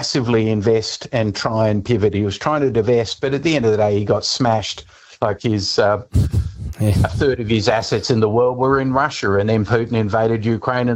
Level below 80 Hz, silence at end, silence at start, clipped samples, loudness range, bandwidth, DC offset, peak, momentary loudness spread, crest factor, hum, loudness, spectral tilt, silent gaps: -36 dBFS; 0 s; 0 s; under 0.1%; 2 LU; 14 kHz; under 0.1%; -2 dBFS; 5 LU; 16 dB; none; -18 LUFS; -6 dB/octave; none